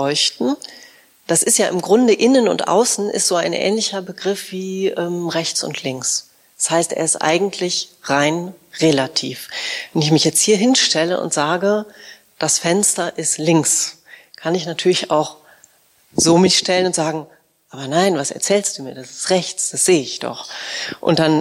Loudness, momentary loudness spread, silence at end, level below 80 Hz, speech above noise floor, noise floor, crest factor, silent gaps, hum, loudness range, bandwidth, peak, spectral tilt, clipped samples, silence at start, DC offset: -17 LUFS; 12 LU; 0 s; -60 dBFS; 35 dB; -53 dBFS; 16 dB; none; none; 4 LU; 16 kHz; -2 dBFS; -3 dB/octave; under 0.1%; 0 s; under 0.1%